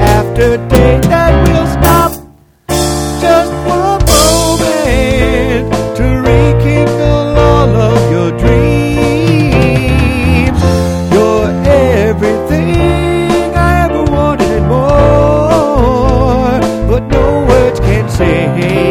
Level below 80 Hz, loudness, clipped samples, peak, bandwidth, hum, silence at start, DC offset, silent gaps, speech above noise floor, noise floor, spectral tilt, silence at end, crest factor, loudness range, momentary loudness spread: -18 dBFS; -10 LUFS; 0.8%; 0 dBFS; over 20 kHz; none; 0 s; under 0.1%; none; 29 dB; -36 dBFS; -6 dB/octave; 0 s; 8 dB; 1 LU; 4 LU